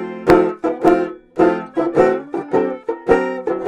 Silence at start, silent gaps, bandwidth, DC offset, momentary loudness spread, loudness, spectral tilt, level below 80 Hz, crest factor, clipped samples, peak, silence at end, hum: 0 s; none; 11.5 kHz; under 0.1%; 8 LU; -17 LUFS; -7.5 dB/octave; -42 dBFS; 16 dB; under 0.1%; 0 dBFS; 0 s; none